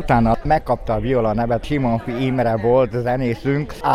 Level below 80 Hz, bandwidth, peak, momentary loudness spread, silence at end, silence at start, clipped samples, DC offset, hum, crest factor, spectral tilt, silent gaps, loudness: -32 dBFS; 13.5 kHz; -4 dBFS; 5 LU; 0 s; 0 s; under 0.1%; under 0.1%; none; 14 dB; -8.5 dB/octave; none; -19 LUFS